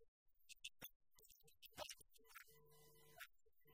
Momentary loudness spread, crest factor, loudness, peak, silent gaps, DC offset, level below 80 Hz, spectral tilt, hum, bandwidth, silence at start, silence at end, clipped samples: 13 LU; 26 dB; -60 LUFS; -38 dBFS; 0.08-0.26 s, 0.96-1.00 s; under 0.1%; -84 dBFS; -1 dB/octave; none; 16 kHz; 0 s; 0 s; under 0.1%